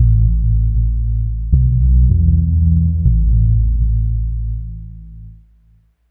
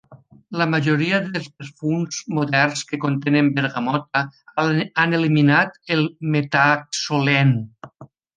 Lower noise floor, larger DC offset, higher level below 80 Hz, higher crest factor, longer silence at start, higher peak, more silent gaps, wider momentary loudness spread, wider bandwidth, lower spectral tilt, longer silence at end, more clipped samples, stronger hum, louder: first, -52 dBFS vs -45 dBFS; neither; first, -16 dBFS vs -64 dBFS; second, 12 dB vs 18 dB; about the same, 0 s vs 0.1 s; about the same, -2 dBFS vs -2 dBFS; neither; first, 12 LU vs 9 LU; second, 0.6 kHz vs 9.6 kHz; first, -15.5 dB/octave vs -5.5 dB/octave; first, 0.75 s vs 0.3 s; neither; neither; first, -16 LUFS vs -20 LUFS